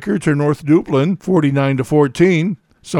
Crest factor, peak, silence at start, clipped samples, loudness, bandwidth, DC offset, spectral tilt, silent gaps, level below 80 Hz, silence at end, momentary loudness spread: 14 dB; 0 dBFS; 0 s; under 0.1%; -15 LUFS; 13 kHz; under 0.1%; -7.5 dB/octave; none; -50 dBFS; 0 s; 4 LU